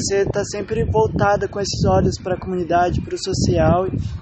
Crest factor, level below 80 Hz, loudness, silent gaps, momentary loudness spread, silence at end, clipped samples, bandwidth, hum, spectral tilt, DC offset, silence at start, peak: 14 dB; -34 dBFS; -19 LUFS; none; 7 LU; 0 s; under 0.1%; 8.8 kHz; none; -5.5 dB/octave; under 0.1%; 0 s; -4 dBFS